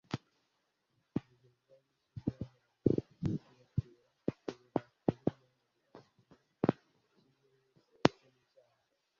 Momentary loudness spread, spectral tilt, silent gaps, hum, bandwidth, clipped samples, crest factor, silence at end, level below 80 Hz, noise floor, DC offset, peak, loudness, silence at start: 13 LU; -6.5 dB/octave; none; none; 7.2 kHz; under 0.1%; 38 dB; 1.1 s; -62 dBFS; -81 dBFS; under 0.1%; -2 dBFS; -38 LUFS; 0.1 s